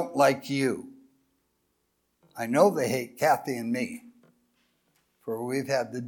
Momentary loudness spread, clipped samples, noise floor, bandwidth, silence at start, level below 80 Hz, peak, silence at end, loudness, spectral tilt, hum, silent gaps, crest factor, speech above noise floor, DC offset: 15 LU; under 0.1%; -75 dBFS; 19 kHz; 0 s; -78 dBFS; -8 dBFS; 0 s; -27 LUFS; -5 dB/octave; none; none; 22 dB; 49 dB; under 0.1%